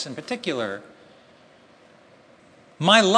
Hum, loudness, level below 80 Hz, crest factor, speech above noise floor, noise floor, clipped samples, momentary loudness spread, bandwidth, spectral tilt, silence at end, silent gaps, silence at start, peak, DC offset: none; -23 LUFS; -72 dBFS; 24 dB; 33 dB; -53 dBFS; under 0.1%; 15 LU; 10.5 kHz; -3.5 dB/octave; 0 s; none; 0 s; 0 dBFS; under 0.1%